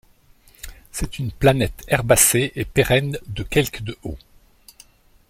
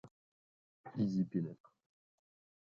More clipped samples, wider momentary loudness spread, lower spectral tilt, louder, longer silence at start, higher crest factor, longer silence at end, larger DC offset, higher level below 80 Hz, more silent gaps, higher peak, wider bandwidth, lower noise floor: neither; about the same, 22 LU vs 23 LU; second, -4 dB/octave vs -9.5 dB/octave; first, -19 LUFS vs -39 LUFS; first, 0.65 s vs 0.05 s; about the same, 22 dB vs 18 dB; about the same, 1.15 s vs 1.1 s; neither; first, -38 dBFS vs -78 dBFS; second, none vs 0.11-0.84 s; first, 0 dBFS vs -24 dBFS; first, 16.5 kHz vs 7 kHz; second, -53 dBFS vs under -90 dBFS